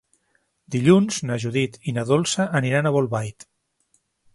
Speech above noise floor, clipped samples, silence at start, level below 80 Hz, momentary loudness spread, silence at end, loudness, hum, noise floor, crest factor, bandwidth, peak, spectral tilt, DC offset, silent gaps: 48 dB; under 0.1%; 0.7 s; -60 dBFS; 11 LU; 1.05 s; -21 LUFS; none; -69 dBFS; 20 dB; 11.5 kHz; -2 dBFS; -5.5 dB/octave; under 0.1%; none